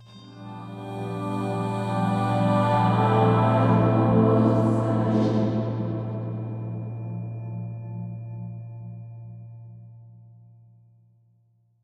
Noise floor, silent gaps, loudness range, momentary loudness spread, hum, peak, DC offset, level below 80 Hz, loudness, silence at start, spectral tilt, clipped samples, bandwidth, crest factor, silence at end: -64 dBFS; none; 19 LU; 20 LU; none; -8 dBFS; under 0.1%; -54 dBFS; -24 LUFS; 0 s; -9 dB/octave; under 0.1%; 9.2 kHz; 18 dB; 1.7 s